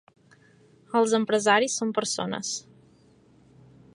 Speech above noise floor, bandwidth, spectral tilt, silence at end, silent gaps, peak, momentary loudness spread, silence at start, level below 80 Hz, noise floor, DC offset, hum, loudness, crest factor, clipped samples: 34 dB; 11 kHz; -3 dB/octave; 1.35 s; none; -6 dBFS; 10 LU; 0.9 s; -74 dBFS; -58 dBFS; under 0.1%; none; -25 LUFS; 22 dB; under 0.1%